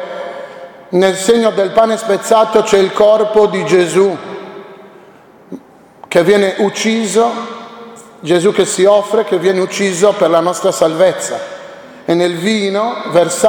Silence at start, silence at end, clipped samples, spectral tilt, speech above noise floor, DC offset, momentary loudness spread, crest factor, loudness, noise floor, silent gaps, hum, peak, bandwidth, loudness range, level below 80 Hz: 0 s; 0 s; under 0.1%; -4 dB/octave; 30 dB; under 0.1%; 19 LU; 14 dB; -12 LUFS; -41 dBFS; none; none; 0 dBFS; 19.5 kHz; 4 LU; -54 dBFS